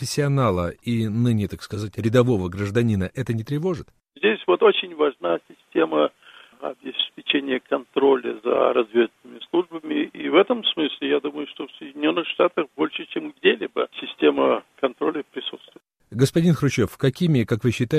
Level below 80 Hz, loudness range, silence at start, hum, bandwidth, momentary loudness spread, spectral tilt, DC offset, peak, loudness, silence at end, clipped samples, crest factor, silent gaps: -54 dBFS; 2 LU; 0 s; none; 15 kHz; 11 LU; -6 dB/octave; under 0.1%; -2 dBFS; -22 LUFS; 0 s; under 0.1%; 20 dB; none